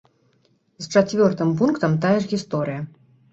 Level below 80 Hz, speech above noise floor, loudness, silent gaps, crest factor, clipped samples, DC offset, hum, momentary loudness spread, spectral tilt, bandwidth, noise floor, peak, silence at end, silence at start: -60 dBFS; 43 dB; -21 LUFS; none; 18 dB; under 0.1%; under 0.1%; none; 12 LU; -6.5 dB/octave; 8.2 kHz; -63 dBFS; -2 dBFS; 0.45 s; 0.8 s